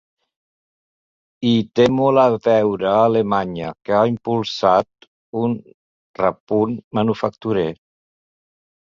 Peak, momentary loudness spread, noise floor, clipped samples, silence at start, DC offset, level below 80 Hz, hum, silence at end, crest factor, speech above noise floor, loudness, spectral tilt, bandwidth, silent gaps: -2 dBFS; 9 LU; under -90 dBFS; under 0.1%; 1.4 s; under 0.1%; -56 dBFS; none; 1.05 s; 18 dB; over 72 dB; -18 LUFS; -7 dB/octave; 7.4 kHz; 5.08-5.33 s, 5.74-6.14 s, 6.40-6.47 s, 6.84-6.91 s